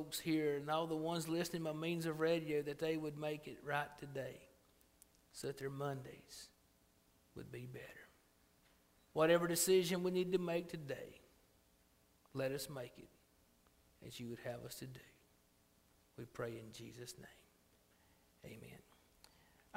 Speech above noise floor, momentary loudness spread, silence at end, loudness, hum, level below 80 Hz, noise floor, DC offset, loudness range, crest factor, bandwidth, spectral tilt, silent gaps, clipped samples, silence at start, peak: 32 dB; 23 LU; 1 s; -41 LUFS; none; -74 dBFS; -73 dBFS; under 0.1%; 16 LU; 22 dB; 16 kHz; -4.5 dB/octave; none; under 0.1%; 0 s; -20 dBFS